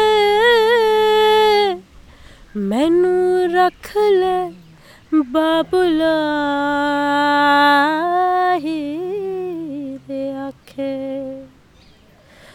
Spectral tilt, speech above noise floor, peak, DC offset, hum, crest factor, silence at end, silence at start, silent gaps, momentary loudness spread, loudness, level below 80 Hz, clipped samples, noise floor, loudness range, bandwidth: -4.5 dB/octave; 32 dB; -2 dBFS; under 0.1%; none; 14 dB; 1.1 s; 0 s; none; 15 LU; -16 LUFS; -50 dBFS; under 0.1%; -49 dBFS; 10 LU; 17 kHz